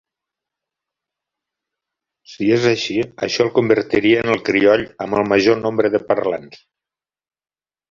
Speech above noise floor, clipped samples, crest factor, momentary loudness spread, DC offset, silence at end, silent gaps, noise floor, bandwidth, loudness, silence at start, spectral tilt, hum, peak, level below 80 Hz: over 73 dB; under 0.1%; 18 dB; 7 LU; under 0.1%; 1.35 s; none; under -90 dBFS; 7.4 kHz; -17 LUFS; 2.3 s; -5.5 dB/octave; none; -2 dBFS; -54 dBFS